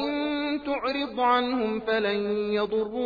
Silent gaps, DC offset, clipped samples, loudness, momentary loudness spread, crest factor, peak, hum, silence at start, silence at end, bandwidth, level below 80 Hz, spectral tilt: none; under 0.1%; under 0.1%; -26 LUFS; 5 LU; 14 dB; -12 dBFS; none; 0 s; 0 s; 5 kHz; -58 dBFS; -7 dB/octave